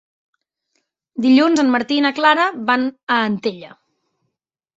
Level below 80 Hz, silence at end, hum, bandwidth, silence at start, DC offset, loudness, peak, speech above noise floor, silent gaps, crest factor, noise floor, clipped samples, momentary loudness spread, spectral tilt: -66 dBFS; 1.1 s; none; 8 kHz; 1.15 s; under 0.1%; -16 LUFS; -2 dBFS; 63 dB; 3.03-3.07 s; 18 dB; -79 dBFS; under 0.1%; 11 LU; -4.5 dB/octave